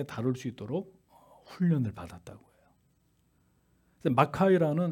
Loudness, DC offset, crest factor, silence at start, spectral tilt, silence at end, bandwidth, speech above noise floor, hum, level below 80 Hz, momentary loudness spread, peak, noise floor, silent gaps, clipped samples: -29 LUFS; under 0.1%; 24 dB; 0 s; -8 dB/octave; 0 s; 14 kHz; 41 dB; none; -66 dBFS; 21 LU; -8 dBFS; -70 dBFS; none; under 0.1%